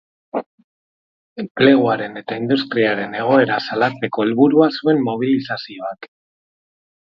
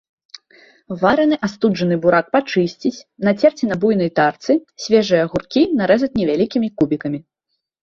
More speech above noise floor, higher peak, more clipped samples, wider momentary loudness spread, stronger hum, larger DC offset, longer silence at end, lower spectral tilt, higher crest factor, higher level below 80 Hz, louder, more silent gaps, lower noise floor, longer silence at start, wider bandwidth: first, over 73 dB vs 58 dB; about the same, 0 dBFS vs -2 dBFS; neither; first, 16 LU vs 6 LU; neither; neither; first, 1.05 s vs 0.6 s; first, -8 dB/octave vs -6.5 dB/octave; about the same, 18 dB vs 16 dB; second, -66 dBFS vs -54 dBFS; about the same, -17 LUFS vs -17 LUFS; first, 0.46-0.58 s, 0.64-1.36 s, 1.51-1.55 s vs none; first, under -90 dBFS vs -75 dBFS; second, 0.35 s vs 0.9 s; second, 6 kHz vs 7.4 kHz